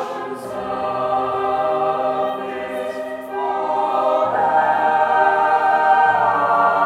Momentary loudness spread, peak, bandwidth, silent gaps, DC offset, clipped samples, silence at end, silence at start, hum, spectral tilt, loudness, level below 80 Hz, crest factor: 11 LU; -4 dBFS; 13.5 kHz; none; under 0.1%; under 0.1%; 0 s; 0 s; none; -5 dB/octave; -18 LUFS; -60 dBFS; 14 dB